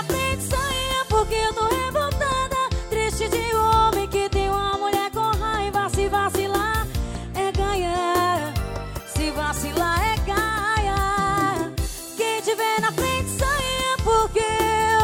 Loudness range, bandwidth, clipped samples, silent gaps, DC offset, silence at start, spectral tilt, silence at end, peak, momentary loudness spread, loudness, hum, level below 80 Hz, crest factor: 2 LU; 18 kHz; under 0.1%; none; under 0.1%; 0 s; -4 dB/octave; 0 s; -6 dBFS; 6 LU; -22 LUFS; none; -32 dBFS; 16 dB